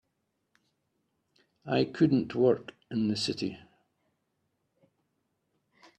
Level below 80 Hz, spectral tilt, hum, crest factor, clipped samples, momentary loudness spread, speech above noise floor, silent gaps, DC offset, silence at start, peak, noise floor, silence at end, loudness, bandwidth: -68 dBFS; -6.5 dB/octave; none; 20 dB; under 0.1%; 10 LU; 52 dB; none; under 0.1%; 1.65 s; -12 dBFS; -80 dBFS; 2.4 s; -29 LUFS; 11 kHz